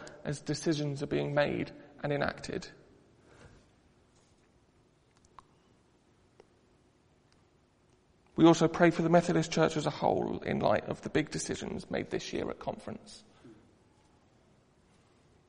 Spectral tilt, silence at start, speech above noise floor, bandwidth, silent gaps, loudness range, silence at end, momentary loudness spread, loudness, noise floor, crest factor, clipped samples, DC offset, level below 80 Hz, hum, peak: -5.5 dB/octave; 0 s; 37 dB; 10.5 kHz; none; 14 LU; 1.95 s; 17 LU; -31 LUFS; -67 dBFS; 24 dB; under 0.1%; under 0.1%; -62 dBFS; none; -10 dBFS